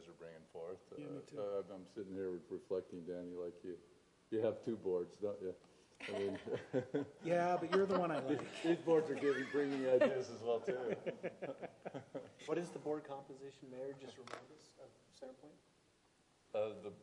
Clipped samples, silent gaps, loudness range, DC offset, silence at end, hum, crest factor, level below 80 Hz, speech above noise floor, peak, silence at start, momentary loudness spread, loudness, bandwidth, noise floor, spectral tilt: under 0.1%; none; 13 LU; under 0.1%; 0 s; none; 22 dB; -84 dBFS; 33 dB; -20 dBFS; 0 s; 18 LU; -41 LUFS; 11 kHz; -74 dBFS; -6.5 dB/octave